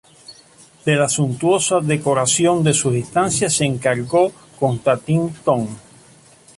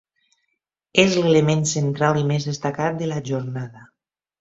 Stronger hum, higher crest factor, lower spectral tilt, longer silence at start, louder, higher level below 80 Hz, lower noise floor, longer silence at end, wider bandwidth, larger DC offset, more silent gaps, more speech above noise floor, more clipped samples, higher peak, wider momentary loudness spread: neither; second, 16 dB vs 22 dB; about the same, -4.5 dB/octave vs -5 dB/octave; second, 0.3 s vs 0.95 s; about the same, -18 LUFS vs -20 LUFS; about the same, -54 dBFS vs -58 dBFS; second, -48 dBFS vs -76 dBFS; first, 0.8 s vs 0.55 s; first, 11.5 kHz vs 8 kHz; neither; neither; second, 31 dB vs 56 dB; neither; about the same, -2 dBFS vs 0 dBFS; second, 6 LU vs 10 LU